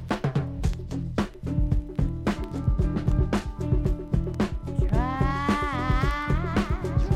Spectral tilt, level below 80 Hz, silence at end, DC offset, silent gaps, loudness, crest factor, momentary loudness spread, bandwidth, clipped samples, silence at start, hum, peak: -7.5 dB/octave; -30 dBFS; 0 s; under 0.1%; none; -27 LUFS; 16 dB; 4 LU; 11.5 kHz; under 0.1%; 0 s; none; -10 dBFS